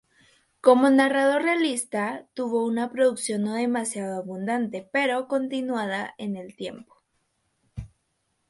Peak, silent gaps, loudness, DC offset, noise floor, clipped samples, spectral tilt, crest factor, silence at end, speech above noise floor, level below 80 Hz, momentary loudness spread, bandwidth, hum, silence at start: -4 dBFS; none; -24 LUFS; under 0.1%; -74 dBFS; under 0.1%; -4.5 dB/octave; 20 dB; 0.6 s; 50 dB; -60 dBFS; 16 LU; 11.5 kHz; none; 0.65 s